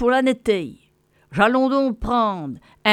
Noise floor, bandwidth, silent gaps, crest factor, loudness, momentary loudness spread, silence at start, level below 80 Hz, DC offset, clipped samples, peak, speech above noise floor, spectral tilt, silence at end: -60 dBFS; 13 kHz; none; 18 dB; -20 LUFS; 13 LU; 0 s; -42 dBFS; under 0.1%; under 0.1%; -2 dBFS; 41 dB; -5.5 dB/octave; 0 s